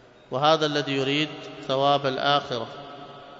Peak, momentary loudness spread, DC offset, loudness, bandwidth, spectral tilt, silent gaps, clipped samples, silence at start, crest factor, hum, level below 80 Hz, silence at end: -6 dBFS; 16 LU; under 0.1%; -24 LUFS; 7.8 kHz; -5 dB/octave; none; under 0.1%; 0.3 s; 20 dB; none; -66 dBFS; 0 s